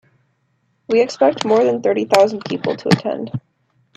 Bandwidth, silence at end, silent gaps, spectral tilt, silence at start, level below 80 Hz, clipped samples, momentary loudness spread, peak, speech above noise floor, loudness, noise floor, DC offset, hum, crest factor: 14 kHz; 0.6 s; none; -5.5 dB/octave; 0.9 s; -62 dBFS; under 0.1%; 10 LU; 0 dBFS; 49 dB; -17 LUFS; -65 dBFS; under 0.1%; none; 18 dB